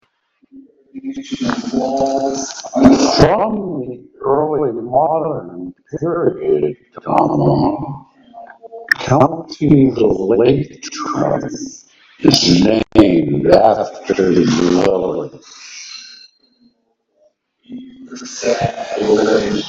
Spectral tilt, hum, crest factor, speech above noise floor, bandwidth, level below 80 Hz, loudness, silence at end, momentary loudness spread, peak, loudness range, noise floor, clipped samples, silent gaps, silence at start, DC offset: -5.5 dB/octave; none; 16 dB; 50 dB; 8.2 kHz; -42 dBFS; -15 LUFS; 0 s; 19 LU; 0 dBFS; 8 LU; -64 dBFS; 0.2%; none; 0.55 s; under 0.1%